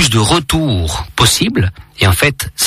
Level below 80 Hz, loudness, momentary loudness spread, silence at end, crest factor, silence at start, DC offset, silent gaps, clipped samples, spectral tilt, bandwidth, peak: -28 dBFS; -13 LUFS; 7 LU; 0 s; 14 dB; 0 s; under 0.1%; none; under 0.1%; -3.5 dB/octave; 15.5 kHz; 0 dBFS